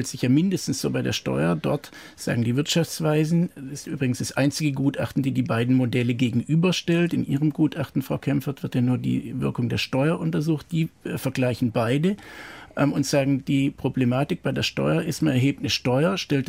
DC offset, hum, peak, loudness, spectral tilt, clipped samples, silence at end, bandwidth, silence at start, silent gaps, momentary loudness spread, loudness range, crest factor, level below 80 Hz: under 0.1%; none; -10 dBFS; -24 LUFS; -6 dB/octave; under 0.1%; 0 s; 16 kHz; 0 s; none; 6 LU; 2 LU; 14 dB; -54 dBFS